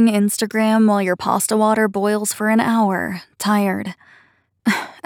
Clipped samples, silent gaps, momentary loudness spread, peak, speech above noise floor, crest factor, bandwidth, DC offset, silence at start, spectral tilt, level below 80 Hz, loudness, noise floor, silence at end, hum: under 0.1%; none; 9 LU; -4 dBFS; 38 dB; 14 dB; 18 kHz; under 0.1%; 0 s; -4.5 dB/octave; -62 dBFS; -18 LUFS; -55 dBFS; 0.15 s; none